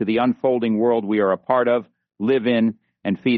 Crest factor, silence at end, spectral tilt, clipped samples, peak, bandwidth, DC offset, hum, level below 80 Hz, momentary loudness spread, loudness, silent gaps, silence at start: 16 dB; 0 s; -5 dB/octave; under 0.1%; -4 dBFS; 4.6 kHz; under 0.1%; none; -64 dBFS; 6 LU; -20 LUFS; none; 0 s